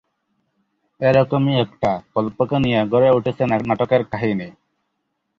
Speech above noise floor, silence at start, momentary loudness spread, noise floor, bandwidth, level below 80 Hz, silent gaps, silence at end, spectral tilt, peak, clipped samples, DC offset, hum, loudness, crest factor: 56 dB; 1 s; 7 LU; -74 dBFS; 7 kHz; -52 dBFS; none; 0.9 s; -8.5 dB/octave; -2 dBFS; under 0.1%; under 0.1%; none; -19 LUFS; 18 dB